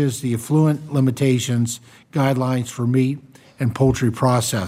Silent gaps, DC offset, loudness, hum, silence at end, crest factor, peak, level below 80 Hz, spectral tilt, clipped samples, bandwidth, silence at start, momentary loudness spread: none; under 0.1%; -20 LUFS; none; 0 s; 16 dB; -4 dBFS; -46 dBFS; -6 dB/octave; under 0.1%; 16 kHz; 0 s; 7 LU